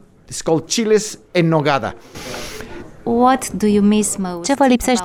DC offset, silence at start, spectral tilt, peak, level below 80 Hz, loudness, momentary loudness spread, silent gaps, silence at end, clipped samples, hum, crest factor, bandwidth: under 0.1%; 0.3 s; -4.5 dB/octave; -2 dBFS; -42 dBFS; -16 LUFS; 16 LU; none; 0 s; under 0.1%; none; 14 dB; 16 kHz